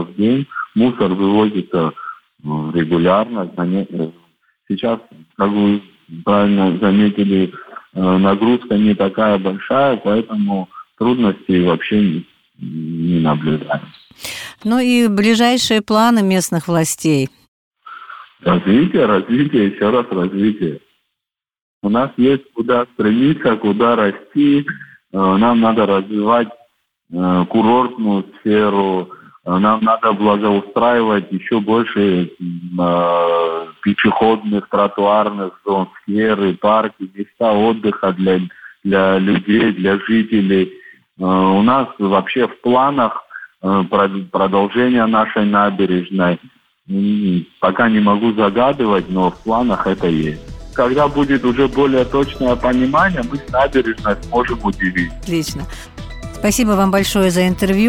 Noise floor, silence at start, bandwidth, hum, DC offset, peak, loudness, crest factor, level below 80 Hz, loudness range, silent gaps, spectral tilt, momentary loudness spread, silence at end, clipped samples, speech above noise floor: -82 dBFS; 0 s; 17 kHz; none; under 0.1%; -2 dBFS; -15 LUFS; 14 dB; -42 dBFS; 3 LU; 17.48-17.71 s, 21.62-21.81 s; -6 dB/octave; 11 LU; 0 s; under 0.1%; 67 dB